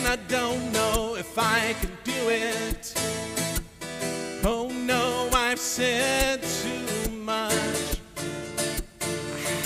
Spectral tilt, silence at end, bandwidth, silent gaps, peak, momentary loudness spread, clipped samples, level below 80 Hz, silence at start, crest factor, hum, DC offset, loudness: -3 dB/octave; 0 s; 16 kHz; none; -8 dBFS; 8 LU; under 0.1%; -40 dBFS; 0 s; 18 dB; none; under 0.1%; -26 LUFS